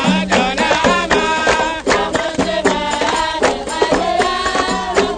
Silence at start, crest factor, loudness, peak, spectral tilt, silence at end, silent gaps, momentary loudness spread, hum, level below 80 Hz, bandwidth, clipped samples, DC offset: 0 s; 16 dB; -15 LUFS; 0 dBFS; -3.5 dB/octave; 0 s; none; 3 LU; none; -36 dBFS; 9.6 kHz; under 0.1%; under 0.1%